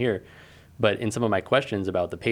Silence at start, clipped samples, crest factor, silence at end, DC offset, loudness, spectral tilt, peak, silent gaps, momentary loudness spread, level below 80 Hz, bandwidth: 0 s; under 0.1%; 20 dB; 0 s; under 0.1%; -25 LUFS; -5.5 dB/octave; -6 dBFS; none; 5 LU; -56 dBFS; 15.5 kHz